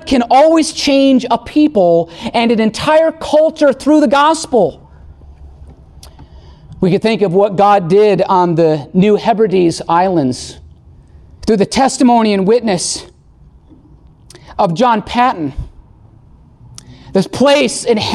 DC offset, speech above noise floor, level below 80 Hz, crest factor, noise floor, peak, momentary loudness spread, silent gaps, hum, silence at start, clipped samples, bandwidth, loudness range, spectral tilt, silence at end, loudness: under 0.1%; 32 dB; -40 dBFS; 12 dB; -43 dBFS; -2 dBFS; 8 LU; none; none; 0 s; under 0.1%; 12.5 kHz; 6 LU; -5 dB/octave; 0 s; -12 LUFS